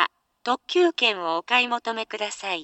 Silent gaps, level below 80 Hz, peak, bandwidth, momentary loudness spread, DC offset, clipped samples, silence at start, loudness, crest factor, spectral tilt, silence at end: none; -76 dBFS; -6 dBFS; 8.4 kHz; 9 LU; under 0.1%; under 0.1%; 0 s; -23 LUFS; 20 dB; -2 dB/octave; 0 s